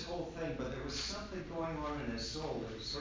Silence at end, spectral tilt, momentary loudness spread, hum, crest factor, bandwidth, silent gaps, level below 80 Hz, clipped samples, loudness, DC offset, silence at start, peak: 0 s; -4.5 dB/octave; 3 LU; none; 14 dB; 7.6 kHz; none; -52 dBFS; under 0.1%; -40 LUFS; under 0.1%; 0 s; -26 dBFS